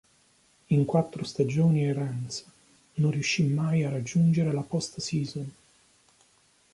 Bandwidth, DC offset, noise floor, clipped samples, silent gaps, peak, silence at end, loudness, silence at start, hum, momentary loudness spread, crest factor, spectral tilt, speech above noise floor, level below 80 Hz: 11.5 kHz; under 0.1%; -64 dBFS; under 0.1%; none; -12 dBFS; 1.25 s; -27 LUFS; 0.7 s; none; 12 LU; 16 dB; -6.5 dB/octave; 38 dB; -64 dBFS